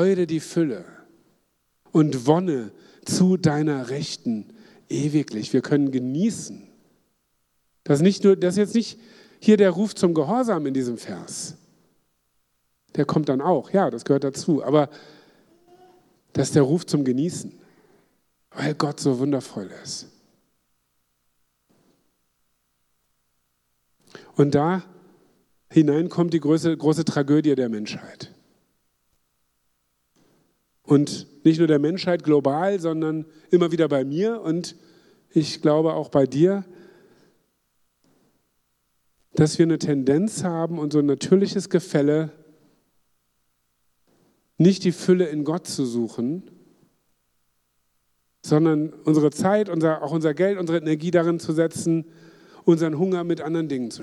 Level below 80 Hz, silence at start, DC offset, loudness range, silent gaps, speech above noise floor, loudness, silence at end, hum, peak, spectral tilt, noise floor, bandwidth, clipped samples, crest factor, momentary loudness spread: -68 dBFS; 0 s; under 0.1%; 7 LU; none; 50 dB; -22 LUFS; 0 s; 60 Hz at -50 dBFS; -4 dBFS; -6.5 dB/octave; -71 dBFS; 12.5 kHz; under 0.1%; 20 dB; 13 LU